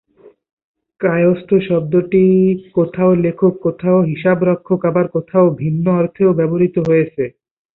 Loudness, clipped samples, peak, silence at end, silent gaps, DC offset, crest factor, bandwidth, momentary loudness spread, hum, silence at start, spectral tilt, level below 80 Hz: -15 LUFS; under 0.1%; -2 dBFS; 0.45 s; none; under 0.1%; 12 dB; 4.1 kHz; 5 LU; none; 1 s; -11 dB/octave; -52 dBFS